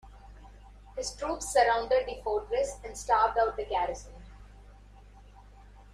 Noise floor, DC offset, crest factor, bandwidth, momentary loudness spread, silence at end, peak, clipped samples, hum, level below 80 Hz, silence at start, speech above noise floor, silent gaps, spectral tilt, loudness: -52 dBFS; under 0.1%; 20 dB; 15 kHz; 14 LU; 0.1 s; -12 dBFS; under 0.1%; 50 Hz at -50 dBFS; -50 dBFS; 0.05 s; 23 dB; none; -2.5 dB/octave; -29 LUFS